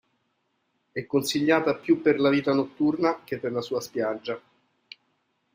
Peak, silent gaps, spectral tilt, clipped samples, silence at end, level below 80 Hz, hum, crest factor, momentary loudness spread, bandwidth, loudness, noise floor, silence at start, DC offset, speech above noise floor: -8 dBFS; none; -5 dB/octave; under 0.1%; 1.15 s; -70 dBFS; none; 20 dB; 12 LU; 16 kHz; -25 LUFS; -74 dBFS; 0.95 s; under 0.1%; 49 dB